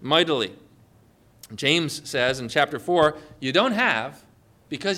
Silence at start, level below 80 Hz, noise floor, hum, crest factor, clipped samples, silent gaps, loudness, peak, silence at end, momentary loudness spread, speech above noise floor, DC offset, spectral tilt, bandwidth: 0 s; -60 dBFS; -57 dBFS; none; 18 dB; under 0.1%; none; -23 LUFS; -6 dBFS; 0 s; 11 LU; 33 dB; under 0.1%; -4 dB/octave; 16 kHz